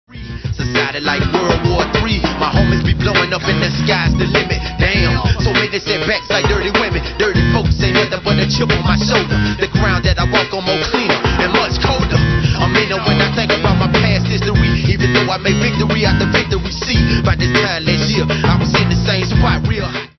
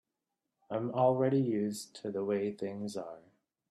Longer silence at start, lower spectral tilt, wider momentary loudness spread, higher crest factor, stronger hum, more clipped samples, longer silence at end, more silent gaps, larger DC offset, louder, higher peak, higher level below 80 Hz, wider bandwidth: second, 0.1 s vs 0.7 s; second, -5.5 dB/octave vs -7 dB/octave; second, 3 LU vs 13 LU; second, 14 dB vs 20 dB; neither; neither; second, 0.1 s vs 0.5 s; neither; neither; first, -14 LUFS vs -33 LUFS; first, 0 dBFS vs -14 dBFS; first, -24 dBFS vs -78 dBFS; second, 6.4 kHz vs 13 kHz